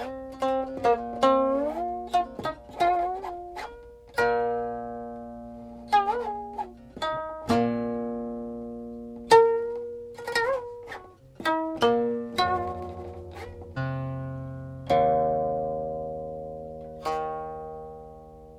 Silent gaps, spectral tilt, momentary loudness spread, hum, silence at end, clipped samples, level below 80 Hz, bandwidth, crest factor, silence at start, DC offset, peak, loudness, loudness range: none; -5.5 dB/octave; 17 LU; none; 0 s; under 0.1%; -54 dBFS; 14 kHz; 24 dB; 0 s; under 0.1%; -4 dBFS; -27 LUFS; 4 LU